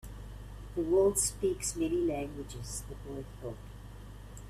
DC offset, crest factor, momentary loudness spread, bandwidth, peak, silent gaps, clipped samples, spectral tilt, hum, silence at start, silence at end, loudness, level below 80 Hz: under 0.1%; 18 dB; 21 LU; 15.5 kHz; -16 dBFS; none; under 0.1%; -4.5 dB/octave; 50 Hz at -45 dBFS; 0.05 s; 0 s; -33 LUFS; -48 dBFS